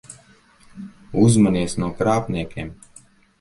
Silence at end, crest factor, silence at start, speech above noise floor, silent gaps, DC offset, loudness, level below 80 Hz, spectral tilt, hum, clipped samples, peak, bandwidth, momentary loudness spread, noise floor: 0.7 s; 18 dB; 0.1 s; 34 dB; none; under 0.1%; -20 LUFS; -46 dBFS; -6.5 dB/octave; none; under 0.1%; -4 dBFS; 11.5 kHz; 24 LU; -52 dBFS